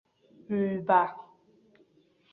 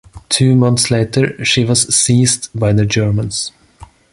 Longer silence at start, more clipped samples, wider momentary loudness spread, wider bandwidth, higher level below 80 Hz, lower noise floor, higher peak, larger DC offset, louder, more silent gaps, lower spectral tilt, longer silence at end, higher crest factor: first, 0.5 s vs 0.15 s; neither; first, 11 LU vs 7 LU; second, 4.3 kHz vs 11.5 kHz; second, -72 dBFS vs -40 dBFS; first, -65 dBFS vs -41 dBFS; second, -10 dBFS vs 0 dBFS; neither; second, -28 LUFS vs -13 LUFS; neither; first, -10 dB/octave vs -4 dB/octave; first, 1.1 s vs 0.3 s; first, 22 dB vs 14 dB